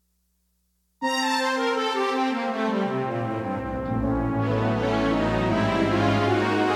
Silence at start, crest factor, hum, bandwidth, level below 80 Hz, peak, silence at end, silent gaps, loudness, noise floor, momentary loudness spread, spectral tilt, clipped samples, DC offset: 1 s; 14 dB; 60 Hz at -55 dBFS; 14 kHz; -42 dBFS; -10 dBFS; 0 s; none; -24 LUFS; -70 dBFS; 6 LU; -6 dB/octave; under 0.1%; under 0.1%